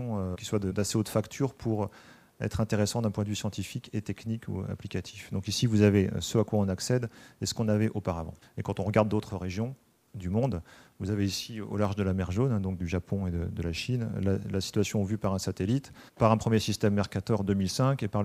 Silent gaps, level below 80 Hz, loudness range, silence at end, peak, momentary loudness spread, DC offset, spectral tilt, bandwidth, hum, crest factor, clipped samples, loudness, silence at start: none; -52 dBFS; 4 LU; 0 s; -8 dBFS; 10 LU; under 0.1%; -6 dB/octave; 15.5 kHz; none; 22 dB; under 0.1%; -30 LUFS; 0 s